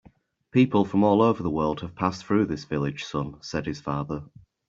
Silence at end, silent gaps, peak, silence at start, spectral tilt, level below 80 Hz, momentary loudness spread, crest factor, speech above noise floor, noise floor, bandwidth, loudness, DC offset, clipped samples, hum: 0.45 s; none; -6 dBFS; 0.55 s; -7 dB/octave; -54 dBFS; 11 LU; 18 dB; 33 dB; -58 dBFS; 7.6 kHz; -25 LUFS; under 0.1%; under 0.1%; none